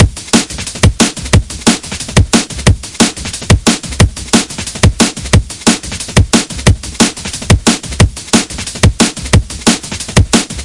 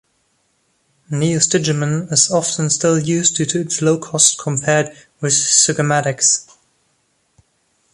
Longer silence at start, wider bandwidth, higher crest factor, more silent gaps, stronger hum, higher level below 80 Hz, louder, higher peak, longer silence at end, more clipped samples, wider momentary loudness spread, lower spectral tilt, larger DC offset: second, 0 s vs 1.1 s; about the same, 12 kHz vs 12.5 kHz; second, 12 dB vs 18 dB; neither; neither; first, -22 dBFS vs -58 dBFS; first, -12 LUFS vs -15 LUFS; about the same, 0 dBFS vs 0 dBFS; second, 0 s vs 1.5 s; first, 0.3% vs under 0.1%; second, 3 LU vs 7 LU; about the same, -4 dB/octave vs -3 dB/octave; neither